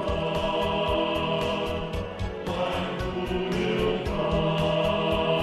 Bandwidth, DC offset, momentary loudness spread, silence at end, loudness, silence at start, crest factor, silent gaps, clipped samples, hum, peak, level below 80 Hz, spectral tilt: 13 kHz; under 0.1%; 6 LU; 0 s; -27 LUFS; 0 s; 14 dB; none; under 0.1%; none; -12 dBFS; -40 dBFS; -6 dB/octave